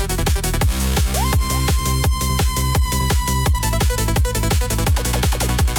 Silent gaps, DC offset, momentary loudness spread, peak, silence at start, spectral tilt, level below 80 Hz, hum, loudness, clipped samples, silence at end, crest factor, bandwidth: none; under 0.1%; 1 LU; -6 dBFS; 0 s; -4 dB/octave; -20 dBFS; none; -18 LUFS; under 0.1%; 0 s; 12 dB; 17.5 kHz